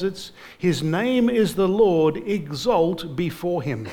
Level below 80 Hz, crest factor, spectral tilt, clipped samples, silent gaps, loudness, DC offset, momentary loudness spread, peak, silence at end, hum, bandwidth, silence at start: -52 dBFS; 14 dB; -6.5 dB/octave; under 0.1%; none; -22 LUFS; under 0.1%; 9 LU; -8 dBFS; 0 s; none; 18.5 kHz; 0 s